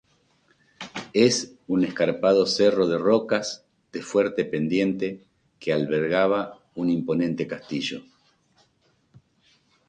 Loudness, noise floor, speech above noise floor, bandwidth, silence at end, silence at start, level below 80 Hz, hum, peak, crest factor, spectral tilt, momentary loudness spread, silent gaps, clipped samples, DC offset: -24 LUFS; -66 dBFS; 43 dB; 9.6 kHz; 1.9 s; 0.8 s; -64 dBFS; none; -6 dBFS; 20 dB; -5 dB/octave; 16 LU; none; under 0.1%; under 0.1%